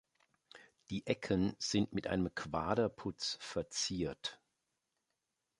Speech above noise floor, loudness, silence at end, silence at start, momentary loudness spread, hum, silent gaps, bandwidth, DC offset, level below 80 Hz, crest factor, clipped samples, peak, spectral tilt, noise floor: 49 dB; -38 LUFS; 1.25 s; 0.55 s; 8 LU; none; none; 11.5 kHz; under 0.1%; -60 dBFS; 22 dB; under 0.1%; -18 dBFS; -4.5 dB/octave; -87 dBFS